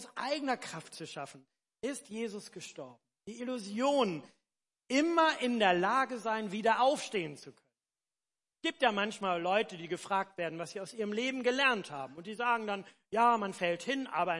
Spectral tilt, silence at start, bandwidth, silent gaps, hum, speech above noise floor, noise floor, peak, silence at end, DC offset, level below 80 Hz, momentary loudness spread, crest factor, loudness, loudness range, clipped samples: -4 dB/octave; 0 s; 11.5 kHz; none; none; over 57 dB; under -90 dBFS; -12 dBFS; 0 s; under 0.1%; -84 dBFS; 16 LU; 20 dB; -33 LUFS; 7 LU; under 0.1%